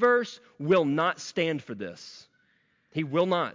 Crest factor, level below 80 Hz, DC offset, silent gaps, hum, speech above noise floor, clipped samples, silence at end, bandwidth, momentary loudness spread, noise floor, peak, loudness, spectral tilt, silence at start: 16 dB; -72 dBFS; under 0.1%; none; none; 42 dB; under 0.1%; 0.05 s; 7.6 kHz; 15 LU; -69 dBFS; -12 dBFS; -28 LUFS; -5.5 dB/octave; 0 s